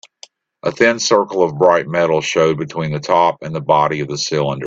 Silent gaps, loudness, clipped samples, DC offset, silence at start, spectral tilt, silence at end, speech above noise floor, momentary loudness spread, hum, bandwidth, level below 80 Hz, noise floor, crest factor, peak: none; -16 LUFS; under 0.1%; under 0.1%; 0.65 s; -4.5 dB/octave; 0 s; 30 dB; 8 LU; none; 8 kHz; -56 dBFS; -45 dBFS; 16 dB; 0 dBFS